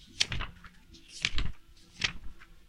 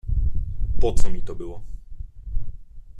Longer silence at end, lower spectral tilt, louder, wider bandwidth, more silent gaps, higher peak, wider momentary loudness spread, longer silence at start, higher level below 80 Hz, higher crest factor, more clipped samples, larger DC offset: about the same, 0.05 s vs 0 s; second, -1.5 dB/octave vs -6.5 dB/octave; second, -34 LUFS vs -30 LUFS; first, 11.5 kHz vs 9.6 kHz; neither; second, -8 dBFS vs -2 dBFS; first, 23 LU vs 17 LU; about the same, 0 s vs 0.05 s; second, -42 dBFS vs -26 dBFS; first, 28 dB vs 16 dB; neither; neither